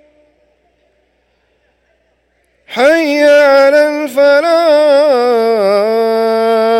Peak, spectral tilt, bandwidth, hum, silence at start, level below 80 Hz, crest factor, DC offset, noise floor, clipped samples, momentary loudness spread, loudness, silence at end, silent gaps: 0 dBFS; -4 dB/octave; 16 kHz; 60 Hz at -65 dBFS; 2.7 s; -60 dBFS; 10 dB; under 0.1%; -58 dBFS; under 0.1%; 5 LU; -9 LUFS; 0 s; none